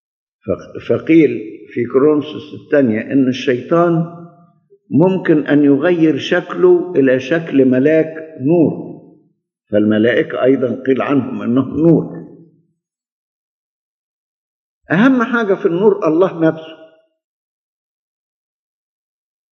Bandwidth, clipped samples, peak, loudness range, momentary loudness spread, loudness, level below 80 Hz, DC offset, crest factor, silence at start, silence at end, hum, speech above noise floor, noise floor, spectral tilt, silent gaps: 6.8 kHz; under 0.1%; 0 dBFS; 7 LU; 12 LU; -14 LUFS; -62 dBFS; under 0.1%; 16 dB; 0.45 s; 2.7 s; none; 57 dB; -71 dBFS; -8 dB/octave; 13.12-14.81 s